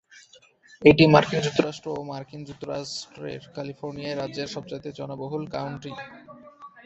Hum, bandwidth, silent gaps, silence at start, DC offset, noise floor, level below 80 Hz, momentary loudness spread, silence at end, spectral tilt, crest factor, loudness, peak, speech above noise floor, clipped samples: none; 8.2 kHz; none; 0.15 s; under 0.1%; -55 dBFS; -56 dBFS; 20 LU; 0.05 s; -6 dB/octave; 24 dB; -24 LUFS; -2 dBFS; 30 dB; under 0.1%